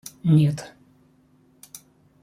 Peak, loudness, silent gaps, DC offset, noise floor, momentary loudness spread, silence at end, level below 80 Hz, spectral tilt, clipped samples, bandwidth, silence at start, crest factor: -8 dBFS; -21 LUFS; none; under 0.1%; -59 dBFS; 25 LU; 1.55 s; -64 dBFS; -7.5 dB/octave; under 0.1%; 15.5 kHz; 0.25 s; 18 dB